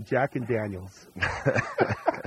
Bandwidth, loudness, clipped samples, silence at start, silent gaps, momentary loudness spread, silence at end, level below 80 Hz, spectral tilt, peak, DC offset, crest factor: 15 kHz; -28 LUFS; under 0.1%; 0 s; none; 10 LU; 0 s; -52 dBFS; -6.5 dB/octave; -8 dBFS; under 0.1%; 20 dB